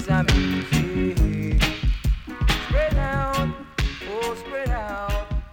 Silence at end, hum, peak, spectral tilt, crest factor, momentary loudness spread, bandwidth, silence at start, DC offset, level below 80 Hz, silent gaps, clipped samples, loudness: 0.05 s; none; -8 dBFS; -5.5 dB/octave; 14 dB; 7 LU; 17 kHz; 0 s; under 0.1%; -26 dBFS; none; under 0.1%; -24 LUFS